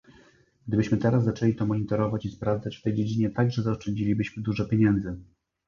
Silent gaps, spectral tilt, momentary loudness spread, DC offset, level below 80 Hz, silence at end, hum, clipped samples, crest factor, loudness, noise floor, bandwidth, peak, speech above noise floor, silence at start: none; -8.5 dB/octave; 6 LU; under 0.1%; -50 dBFS; 0.45 s; none; under 0.1%; 18 dB; -26 LUFS; -59 dBFS; 7.2 kHz; -8 dBFS; 33 dB; 0.65 s